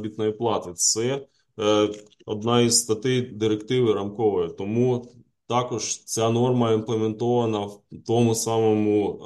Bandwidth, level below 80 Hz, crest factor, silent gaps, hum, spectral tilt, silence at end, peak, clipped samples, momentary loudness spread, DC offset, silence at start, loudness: 12.5 kHz; -62 dBFS; 18 dB; none; none; -4.5 dB/octave; 0 s; -6 dBFS; under 0.1%; 7 LU; under 0.1%; 0 s; -23 LUFS